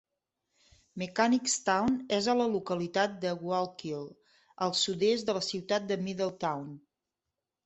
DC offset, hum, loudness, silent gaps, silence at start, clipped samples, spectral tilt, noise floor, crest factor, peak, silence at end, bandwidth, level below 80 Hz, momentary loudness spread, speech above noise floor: under 0.1%; none; -31 LUFS; none; 0.95 s; under 0.1%; -3.5 dB/octave; -88 dBFS; 20 dB; -12 dBFS; 0.85 s; 8.4 kHz; -68 dBFS; 12 LU; 58 dB